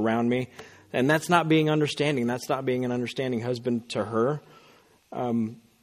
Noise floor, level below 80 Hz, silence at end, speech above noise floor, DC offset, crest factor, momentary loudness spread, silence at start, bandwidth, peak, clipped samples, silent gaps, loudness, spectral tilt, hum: -58 dBFS; -66 dBFS; 0.25 s; 32 dB; under 0.1%; 22 dB; 11 LU; 0 s; 15.5 kHz; -4 dBFS; under 0.1%; none; -26 LUFS; -6 dB/octave; none